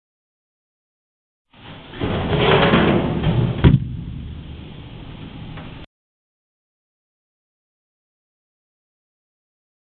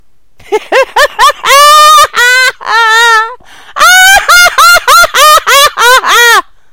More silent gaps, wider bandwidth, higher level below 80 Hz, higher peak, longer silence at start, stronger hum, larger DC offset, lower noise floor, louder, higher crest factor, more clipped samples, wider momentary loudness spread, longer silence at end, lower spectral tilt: neither; second, 4.5 kHz vs over 20 kHz; about the same, -36 dBFS vs -36 dBFS; about the same, 0 dBFS vs 0 dBFS; first, 1.65 s vs 0.5 s; neither; second, under 0.1% vs 1%; about the same, -39 dBFS vs -40 dBFS; second, -17 LUFS vs -3 LUFS; first, 24 dB vs 6 dB; second, under 0.1% vs 10%; first, 22 LU vs 7 LU; first, 4.15 s vs 0.3 s; first, -11 dB/octave vs 1.5 dB/octave